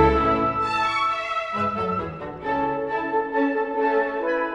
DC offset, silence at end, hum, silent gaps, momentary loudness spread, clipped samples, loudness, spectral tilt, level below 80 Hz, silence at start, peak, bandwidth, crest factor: under 0.1%; 0 s; none; none; 5 LU; under 0.1%; -23 LUFS; -6.5 dB/octave; -40 dBFS; 0 s; -4 dBFS; 10.5 kHz; 18 dB